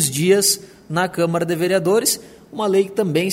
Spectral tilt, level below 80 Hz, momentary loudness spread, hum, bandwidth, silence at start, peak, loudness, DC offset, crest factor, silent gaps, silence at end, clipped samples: -4 dB/octave; -60 dBFS; 10 LU; none; 16.5 kHz; 0 s; -2 dBFS; -18 LUFS; under 0.1%; 16 dB; none; 0 s; under 0.1%